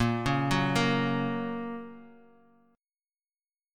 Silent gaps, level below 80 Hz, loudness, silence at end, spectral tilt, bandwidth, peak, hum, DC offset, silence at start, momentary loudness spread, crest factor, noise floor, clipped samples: none; -52 dBFS; -29 LUFS; 1.6 s; -6 dB/octave; 15.5 kHz; -12 dBFS; none; under 0.1%; 0 s; 14 LU; 18 dB; under -90 dBFS; under 0.1%